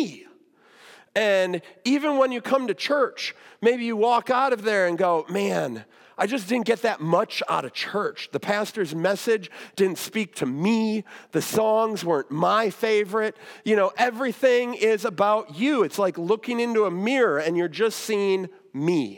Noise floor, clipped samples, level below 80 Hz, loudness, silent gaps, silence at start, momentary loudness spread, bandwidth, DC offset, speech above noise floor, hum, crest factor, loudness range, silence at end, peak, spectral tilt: -56 dBFS; under 0.1%; -80 dBFS; -24 LUFS; none; 0 s; 7 LU; 18 kHz; under 0.1%; 32 dB; none; 16 dB; 3 LU; 0 s; -8 dBFS; -5 dB/octave